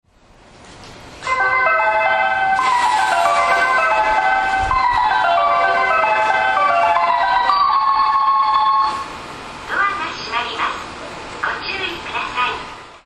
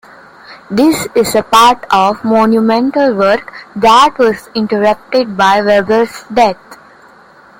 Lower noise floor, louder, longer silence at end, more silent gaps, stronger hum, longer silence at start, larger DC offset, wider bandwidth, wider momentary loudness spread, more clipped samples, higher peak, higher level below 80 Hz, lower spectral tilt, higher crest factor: first, -48 dBFS vs -41 dBFS; second, -16 LUFS vs -11 LUFS; second, 0.1 s vs 0.85 s; neither; neither; about the same, 0.6 s vs 0.5 s; neither; second, 13 kHz vs 17 kHz; about the same, 10 LU vs 8 LU; neither; about the same, -2 dBFS vs 0 dBFS; about the same, -44 dBFS vs -46 dBFS; second, -2.5 dB/octave vs -4.5 dB/octave; about the same, 16 dB vs 12 dB